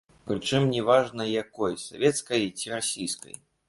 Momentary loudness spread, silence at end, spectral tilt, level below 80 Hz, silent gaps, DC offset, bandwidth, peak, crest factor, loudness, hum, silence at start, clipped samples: 10 LU; 0.5 s; -4 dB/octave; -62 dBFS; none; under 0.1%; 11.5 kHz; -8 dBFS; 20 dB; -27 LUFS; none; 0.25 s; under 0.1%